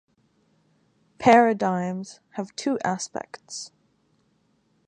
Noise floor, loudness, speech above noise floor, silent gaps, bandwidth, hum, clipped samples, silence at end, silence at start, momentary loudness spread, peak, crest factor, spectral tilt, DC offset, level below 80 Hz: -67 dBFS; -23 LUFS; 44 dB; none; 10.5 kHz; none; under 0.1%; 1.2 s; 1.2 s; 20 LU; -4 dBFS; 22 dB; -5 dB/octave; under 0.1%; -66 dBFS